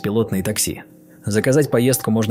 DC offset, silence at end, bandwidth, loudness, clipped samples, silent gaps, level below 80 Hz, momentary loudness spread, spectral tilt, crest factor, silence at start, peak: under 0.1%; 0 s; 16 kHz; -19 LUFS; under 0.1%; none; -50 dBFS; 8 LU; -5 dB/octave; 16 dB; 0 s; -4 dBFS